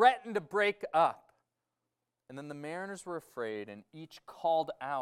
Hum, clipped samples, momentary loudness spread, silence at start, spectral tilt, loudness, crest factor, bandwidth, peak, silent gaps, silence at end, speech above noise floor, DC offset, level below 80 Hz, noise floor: none; under 0.1%; 20 LU; 0 s; -4.5 dB/octave; -33 LUFS; 22 dB; 14 kHz; -12 dBFS; none; 0 s; 54 dB; under 0.1%; -80 dBFS; -87 dBFS